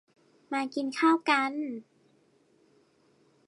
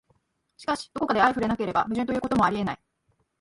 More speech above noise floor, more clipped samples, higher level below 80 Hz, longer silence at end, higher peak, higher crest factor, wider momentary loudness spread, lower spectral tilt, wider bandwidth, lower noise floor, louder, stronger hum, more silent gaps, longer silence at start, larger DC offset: second, 38 dB vs 46 dB; neither; second, -88 dBFS vs -54 dBFS; first, 1.65 s vs 0.65 s; second, -10 dBFS vs -6 dBFS; about the same, 22 dB vs 20 dB; first, 13 LU vs 10 LU; second, -3 dB/octave vs -6 dB/octave; about the same, 11 kHz vs 11.5 kHz; second, -66 dBFS vs -71 dBFS; second, -28 LUFS vs -25 LUFS; neither; neither; about the same, 0.5 s vs 0.6 s; neither